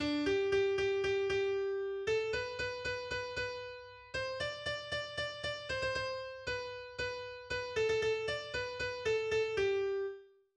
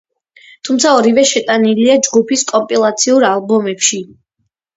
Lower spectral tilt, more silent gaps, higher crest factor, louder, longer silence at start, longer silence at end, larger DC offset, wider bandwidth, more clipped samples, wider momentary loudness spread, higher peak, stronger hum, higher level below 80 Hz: first, -4 dB/octave vs -2.5 dB/octave; neither; about the same, 14 dB vs 14 dB; second, -36 LUFS vs -12 LUFS; second, 0 s vs 0.65 s; second, 0.3 s vs 0.7 s; neither; first, 9.8 kHz vs 8 kHz; neither; first, 8 LU vs 5 LU; second, -22 dBFS vs 0 dBFS; neither; about the same, -60 dBFS vs -60 dBFS